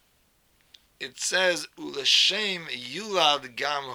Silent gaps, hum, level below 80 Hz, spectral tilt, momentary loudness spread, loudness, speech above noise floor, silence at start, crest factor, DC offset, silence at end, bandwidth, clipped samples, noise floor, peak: none; none; -72 dBFS; -0.5 dB/octave; 15 LU; -24 LUFS; 39 dB; 1 s; 22 dB; under 0.1%; 0 s; over 20 kHz; under 0.1%; -66 dBFS; -6 dBFS